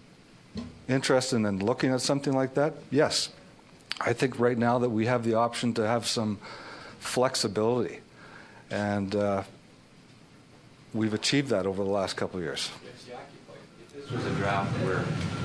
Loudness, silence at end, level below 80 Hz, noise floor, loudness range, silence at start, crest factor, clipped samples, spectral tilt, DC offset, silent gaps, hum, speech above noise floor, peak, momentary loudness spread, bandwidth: -28 LUFS; 0 s; -62 dBFS; -54 dBFS; 5 LU; 0.55 s; 20 dB; under 0.1%; -5 dB/octave; under 0.1%; none; none; 27 dB; -8 dBFS; 19 LU; 11 kHz